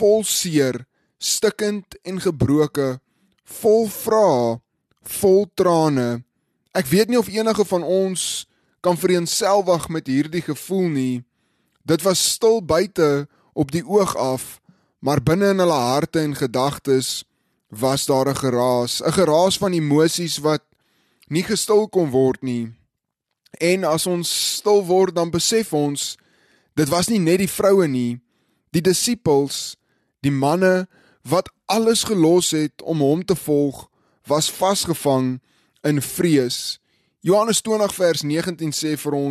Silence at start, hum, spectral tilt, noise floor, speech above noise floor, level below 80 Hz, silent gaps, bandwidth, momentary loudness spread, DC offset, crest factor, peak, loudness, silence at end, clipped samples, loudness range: 0 s; none; -4.5 dB/octave; -79 dBFS; 60 dB; -54 dBFS; none; 13 kHz; 10 LU; under 0.1%; 14 dB; -6 dBFS; -19 LUFS; 0 s; under 0.1%; 2 LU